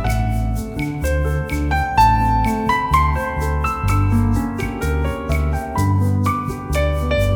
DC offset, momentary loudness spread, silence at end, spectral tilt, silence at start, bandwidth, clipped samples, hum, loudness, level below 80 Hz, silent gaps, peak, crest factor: under 0.1%; 7 LU; 0 s; -6.5 dB/octave; 0 s; 19.5 kHz; under 0.1%; none; -19 LUFS; -24 dBFS; none; -2 dBFS; 16 dB